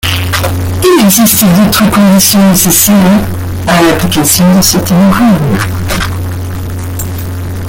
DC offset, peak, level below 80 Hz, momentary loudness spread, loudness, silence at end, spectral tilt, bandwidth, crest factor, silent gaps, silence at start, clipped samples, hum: under 0.1%; 0 dBFS; -28 dBFS; 13 LU; -7 LUFS; 0 s; -4.5 dB/octave; over 20 kHz; 8 dB; none; 0.05 s; 0.3%; none